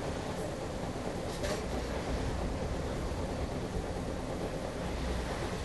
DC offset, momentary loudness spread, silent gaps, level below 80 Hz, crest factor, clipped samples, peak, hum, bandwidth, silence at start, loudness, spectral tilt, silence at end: 0.2%; 2 LU; none; -42 dBFS; 16 dB; under 0.1%; -20 dBFS; none; 12 kHz; 0 s; -37 LUFS; -5.5 dB/octave; 0 s